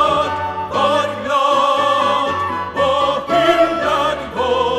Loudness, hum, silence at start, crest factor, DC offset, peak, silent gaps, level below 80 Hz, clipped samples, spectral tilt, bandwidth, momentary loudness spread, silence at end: -16 LUFS; none; 0 s; 14 dB; under 0.1%; -2 dBFS; none; -44 dBFS; under 0.1%; -4 dB/octave; 15 kHz; 6 LU; 0 s